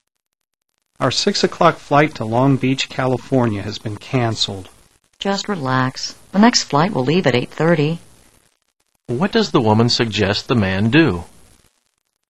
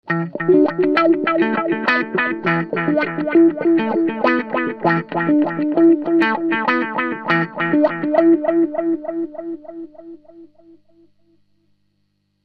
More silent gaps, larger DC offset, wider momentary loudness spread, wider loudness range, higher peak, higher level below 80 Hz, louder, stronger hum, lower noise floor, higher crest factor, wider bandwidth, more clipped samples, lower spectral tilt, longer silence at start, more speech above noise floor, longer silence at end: neither; first, 0.8% vs under 0.1%; about the same, 8 LU vs 8 LU; second, 3 LU vs 8 LU; about the same, 0 dBFS vs -2 dBFS; first, -48 dBFS vs -62 dBFS; about the same, -17 LUFS vs -17 LUFS; second, none vs 50 Hz at -55 dBFS; first, -77 dBFS vs -67 dBFS; about the same, 18 dB vs 16 dB; first, 12.5 kHz vs 5.6 kHz; neither; second, -5 dB/octave vs -8.5 dB/octave; first, 1 s vs 0.05 s; first, 60 dB vs 49 dB; second, 1.05 s vs 2 s